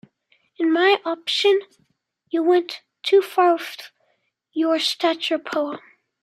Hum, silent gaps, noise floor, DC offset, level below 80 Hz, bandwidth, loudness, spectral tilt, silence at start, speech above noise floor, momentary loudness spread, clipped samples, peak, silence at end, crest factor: none; none; -69 dBFS; under 0.1%; -80 dBFS; 15 kHz; -20 LUFS; -2 dB/octave; 0.6 s; 49 dB; 13 LU; under 0.1%; -4 dBFS; 0.45 s; 18 dB